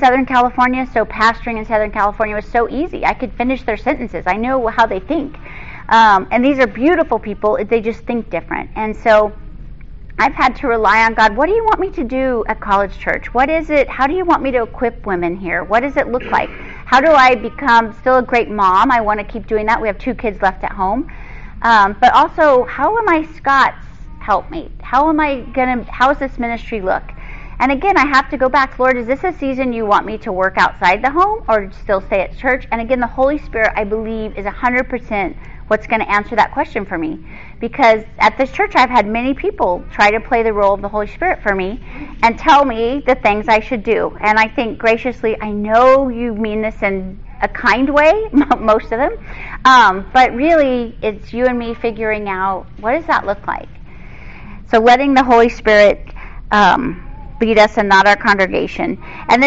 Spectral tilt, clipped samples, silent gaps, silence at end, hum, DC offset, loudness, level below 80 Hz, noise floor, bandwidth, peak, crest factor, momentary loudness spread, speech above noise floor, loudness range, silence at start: -2.5 dB/octave; under 0.1%; none; 0 s; none; 2%; -14 LUFS; -32 dBFS; -34 dBFS; 8 kHz; 0 dBFS; 14 dB; 11 LU; 20 dB; 5 LU; 0 s